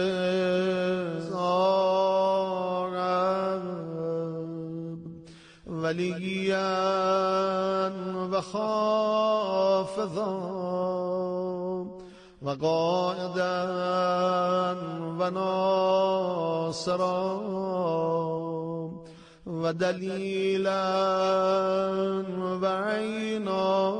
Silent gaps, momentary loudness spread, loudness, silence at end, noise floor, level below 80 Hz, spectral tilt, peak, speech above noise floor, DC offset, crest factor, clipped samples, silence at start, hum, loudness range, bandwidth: none; 10 LU; -27 LUFS; 0 s; -49 dBFS; -66 dBFS; -6 dB/octave; -14 dBFS; 22 dB; under 0.1%; 14 dB; under 0.1%; 0 s; none; 4 LU; 10 kHz